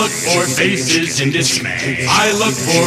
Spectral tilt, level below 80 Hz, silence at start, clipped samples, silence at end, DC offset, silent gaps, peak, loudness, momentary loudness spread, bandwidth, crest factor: -3 dB/octave; -50 dBFS; 0 s; under 0.1%; 0 s; under 0.1%; none; 0 dBFS; -14 LUFS; 4 LU; 15.5 kHz; 14 dB